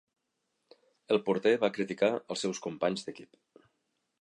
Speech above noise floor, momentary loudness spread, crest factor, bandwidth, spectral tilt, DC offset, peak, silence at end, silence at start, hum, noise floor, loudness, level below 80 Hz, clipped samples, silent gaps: 51 dB; 10 LU; 20 dB; 11 kHz; -4.5 dB/octave; under 0.1%; -12 dBFS; 0.95 s; 1.1 s; none; -81 dBFS; -31 LUFS; -78 dBFS; under 0.1%; none